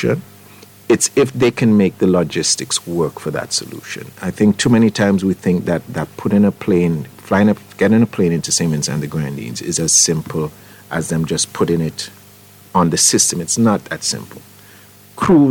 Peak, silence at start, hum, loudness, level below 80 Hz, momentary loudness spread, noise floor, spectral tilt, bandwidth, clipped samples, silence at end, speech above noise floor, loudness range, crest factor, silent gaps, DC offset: -2 dBFS; 0 s; none; -16 LUFS; -48 dBFS; 12 LU; -43 dBFS; -4 dB/octave; 19 kHz; under 0.1%; 0 s; 27 dB; 2 LU; 14 dB; none; under 0.1%